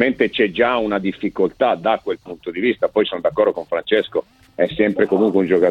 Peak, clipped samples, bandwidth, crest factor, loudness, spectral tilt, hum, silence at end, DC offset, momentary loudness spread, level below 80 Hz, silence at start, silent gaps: -2 dBFS; under 0.1%; 6.4 kHz; 16 dB; -19 LUFS; -7.5 dB/octave; none; 0 s; under 0.1%; 8 LU; -52 dBFS; 0 s; none